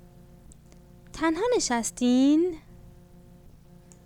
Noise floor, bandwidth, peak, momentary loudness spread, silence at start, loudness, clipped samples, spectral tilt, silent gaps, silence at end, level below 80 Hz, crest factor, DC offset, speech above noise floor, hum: -52 dBFS; 15 kHz; -12 dBFS; 13 LU; 0.5 s; -24 LUFS; under 0.1%; -3.5 dB/octave; none; 1.15 s; -52 dBFS; 16 dB; under 0.1%; 28 dB; none